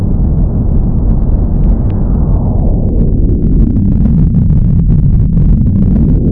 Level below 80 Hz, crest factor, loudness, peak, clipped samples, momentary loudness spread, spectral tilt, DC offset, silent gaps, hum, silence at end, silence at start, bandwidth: -10 dBFS; 8 dB; -11 LUFS; 0 dBFS; under 0.1%; 3 LU; -14 dB/octave; under 0.1%; none; none; 0 s; 0 s; 1.8 kHz